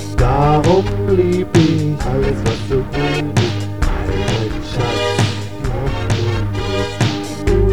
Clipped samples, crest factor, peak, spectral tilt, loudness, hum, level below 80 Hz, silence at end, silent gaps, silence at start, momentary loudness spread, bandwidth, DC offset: under 0.1%; 16 dB; 0 dBFS; -6.5 dB/octave; -17 LUFS; none; -24 dBFS; 0 s; none; 0 s; 7 LU; 14 kHz; 2%